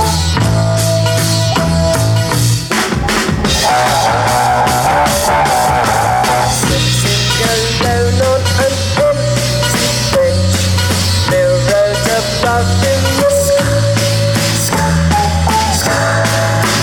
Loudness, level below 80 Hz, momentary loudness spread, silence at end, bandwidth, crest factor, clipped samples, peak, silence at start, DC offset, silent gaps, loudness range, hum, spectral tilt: -12 LUFS; -26 dBFS; 2 LU; 0 s; 19.5 kHz; 10 dB; under 0.1%; -2 dBFS; 0 s; under 0.1%; none; 1 LU; none; -4 dB/octave